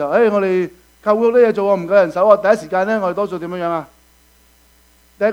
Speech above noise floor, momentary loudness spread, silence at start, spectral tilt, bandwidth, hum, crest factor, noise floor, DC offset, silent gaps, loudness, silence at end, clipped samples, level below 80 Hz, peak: 37 dB; 10 LU; 0 s; -7 dB/octave; 15 kHz; none; 16 dB; -52 dBFS; under 0.1%; none; -16 LUFS; 0 s; under 0.1%; -56 dBFS; 0 dBFS